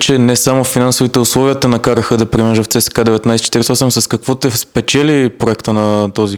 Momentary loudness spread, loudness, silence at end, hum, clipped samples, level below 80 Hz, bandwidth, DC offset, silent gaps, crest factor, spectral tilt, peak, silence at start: 4 LU; -12 LUFS; 0 s; none; 0.1%; -40 dBFS; over 20 kHz; under 0.1%; none; 12 dB; -4.5 dB/octave; 0 dBFS; 0 s